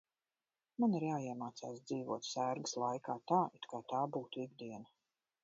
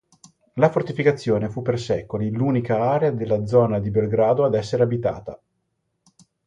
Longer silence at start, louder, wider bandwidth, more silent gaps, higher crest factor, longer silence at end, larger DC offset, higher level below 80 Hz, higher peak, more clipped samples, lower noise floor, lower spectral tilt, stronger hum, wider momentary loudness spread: first, 0.8 s vs 0.55 s; second, -40 LUFS vs -21 LUFS; second, 7.4 kHz vs 9.6 kHz; neither; about the same, 22 dB vs 18 dB; second, 0.6 s vs 1.1 s; neither; second, -88 dBFS vs -52 dBFS; second, -20 dBFS vs -4 dBFS; neither; first, under -90 dBFS vs -74 dBFS; second, -5.5 dB/octave vs -8 dB/octave; neither; first, 13 LU vs 7 LU